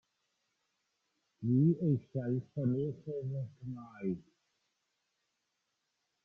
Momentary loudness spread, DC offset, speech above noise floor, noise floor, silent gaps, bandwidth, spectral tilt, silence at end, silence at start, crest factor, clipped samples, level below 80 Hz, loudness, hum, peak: 14 LU; under 0.1%; 50 dB; -84 dBFS; none; 3.6 kHz; -12 dB/octave; 2.05 s; 1.4 s; 18 dB; under 0.1%; -74 dBFS; -35 LUFS; none; -20 dBFS